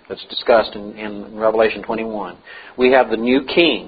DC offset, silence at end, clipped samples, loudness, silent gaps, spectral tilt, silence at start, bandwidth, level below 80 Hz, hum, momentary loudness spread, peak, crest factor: under 0.1%; 0 s; under 0.1%; -17 LUFS; none; -8.5 dB/octave; 0.1 s; 5 kHz; -50 dBFS; none; 15 LU; 0 dBFS; 18 dB